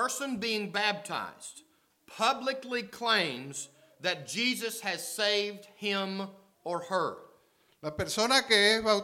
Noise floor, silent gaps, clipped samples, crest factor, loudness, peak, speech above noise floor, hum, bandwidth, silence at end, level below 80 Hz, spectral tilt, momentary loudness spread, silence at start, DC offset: -66 dBFS; none; under 0.1%; 22 dB; -30 LUFS; -8 dBFS; 35 dB; none; 17 kHz; 0 s; -66 dBFS; -2 dB/octave; 18 LU; 0 s; under 0.1%